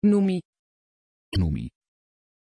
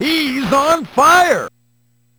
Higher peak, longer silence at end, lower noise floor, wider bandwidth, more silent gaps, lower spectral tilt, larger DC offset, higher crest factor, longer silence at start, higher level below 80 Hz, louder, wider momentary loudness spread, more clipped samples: second, -12 dBFS vs 0 dBFS; first, 0.9 s vs 0.7 s; first, under -90 dBFS vs -59 dBFS; second, 11 kHz vs over 20 kHz; first, 0.45-0.53 s, 0.59-1.32 s vs none; first, -8.5 dB/octave vs -3 dB/octave; neither; about the same, 16 dB vs 14 dB; about the same, 0 s vs 0 s; first, -42 dBFS vs -48 dBFS; second, -26 LUFS vs -13 LUFS; first, 11 LU vs 8 LU; neither